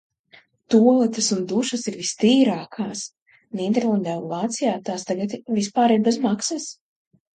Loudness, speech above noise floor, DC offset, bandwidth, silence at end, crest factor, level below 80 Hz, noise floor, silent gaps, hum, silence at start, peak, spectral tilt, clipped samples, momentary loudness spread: -21 LUFS; 34 dB; under 0.1%; 9.4 kHz; 0.65 s; 18 dB; -70 dBFS; -55 dBFS; 3.22-3.26 s; none; 0.7 s; -4 dBFS; -4.5 dB/octave; under 0.1%; 12 LU